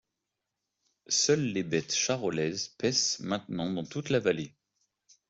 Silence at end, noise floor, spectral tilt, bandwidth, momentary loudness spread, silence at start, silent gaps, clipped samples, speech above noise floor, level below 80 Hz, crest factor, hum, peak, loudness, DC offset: 0.8 s; -86 dBFS; -3.5 dB/octave; 8.2 kHz; 8 LU; 1.1 s; none; under 0.1%; 56 dB; -70 dBFS; 20 dB; none; -12 dBFS; -29 LUFS; under 0.1%